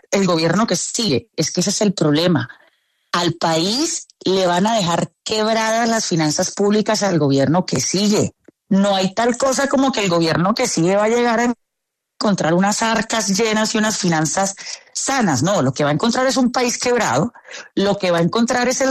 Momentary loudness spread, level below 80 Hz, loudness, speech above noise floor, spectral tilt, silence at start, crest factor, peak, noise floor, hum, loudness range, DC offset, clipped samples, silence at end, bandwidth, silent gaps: 5 LU; -54 dBFS; -17 LUFS; 61 dB; -4 dB/octave; 0.1 s; 14 dB; -4 dBFS; -78 dBFS; none; 1 LU; under 0.1%; under 0.1%; 0 s; 13.5 kHz; none